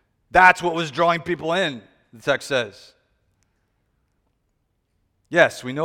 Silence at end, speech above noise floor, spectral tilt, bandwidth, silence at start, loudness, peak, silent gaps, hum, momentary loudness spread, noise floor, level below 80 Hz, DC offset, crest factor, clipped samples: 0 s; 51 dB; -4.5 dB/octave; 16.5 kHz; 0.35 s; -20 LUFS; 0 dBFS; none; none; 12 LU; -71 dBFS; -54 dBFS; under 0.1%; 22 dB; under 0.1%